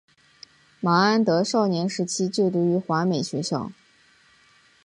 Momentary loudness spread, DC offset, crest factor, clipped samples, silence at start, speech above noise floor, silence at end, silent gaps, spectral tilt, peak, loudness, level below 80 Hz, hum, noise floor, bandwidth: 9 LU; under 0.1%; 18 dB; under 0.1%; 0.8 s; 36 dB; 1.15 s; none; -5.5 dB/octave; -6 dBFS; -23 LUFS; -68 dBFS; none; -58 dBFS; 11 kHz